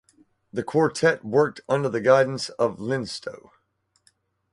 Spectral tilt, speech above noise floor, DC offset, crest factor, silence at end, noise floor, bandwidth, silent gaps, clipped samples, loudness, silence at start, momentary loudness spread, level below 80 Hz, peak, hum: -5.5 dB/octave; 47 dB; under 0.1%; 22 dB; 1.15 s; -70 dBFS; 11.5 kHz; none; under 0.1%; -23 LUFS; 0.55 s; 14 LU; -64 dBFS; -4 dBFS; none